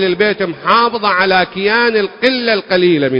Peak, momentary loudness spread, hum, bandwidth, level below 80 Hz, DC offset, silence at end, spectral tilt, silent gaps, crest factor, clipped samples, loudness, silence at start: 0 dBFS; 3 LU; none; 8 kHz; -52 dBFS; under 0.1%; 0 s; -7 dB/octave; none; 12 dB; under 0.1%; -13 LUFS; 0 s